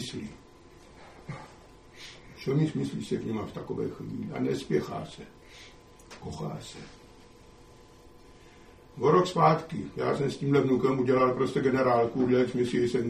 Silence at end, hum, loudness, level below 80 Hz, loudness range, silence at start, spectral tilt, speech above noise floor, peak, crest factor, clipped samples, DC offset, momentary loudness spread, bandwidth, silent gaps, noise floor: 0 s; none; -28 LUFS; -58 dBFS; 18 LU; 0 s; -7 dB/octave; 26 dB; -8 dBFS; 20 dB; under 0.1%; under 0.1%; 22 LU; 13.5 kHz; none; -53 dBFS